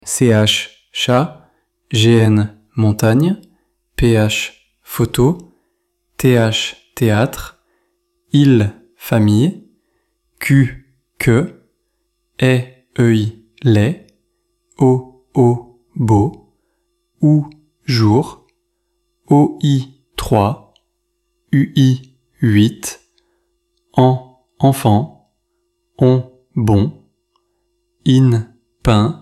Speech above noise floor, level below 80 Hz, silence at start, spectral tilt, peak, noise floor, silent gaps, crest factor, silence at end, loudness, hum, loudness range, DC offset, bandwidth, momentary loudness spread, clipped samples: 56 dB; -40 dBFS; 0.05 s; -6.5 dB/octave; 0 dBFS; -69 dBFS; none; 16 dB; 0.05 s; -15 LUFS; none; 3 LU; under 0.1%; 15 kHz; 14 LU; under 0.1%